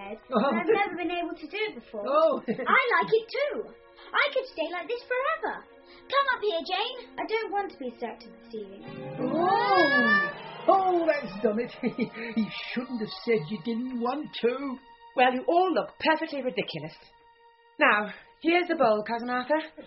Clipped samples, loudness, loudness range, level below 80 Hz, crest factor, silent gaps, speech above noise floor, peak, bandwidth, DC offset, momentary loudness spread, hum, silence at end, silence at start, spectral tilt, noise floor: under 0.1%; -27 LUFS; 6 LU; -68 dBFS; 22 dB; none; 31 dB; -6 dBFS; 5.8 kHz; under 0.1%; 14 LU; none; 0 s; 0 s; -2 dB/octave; -58 dBFS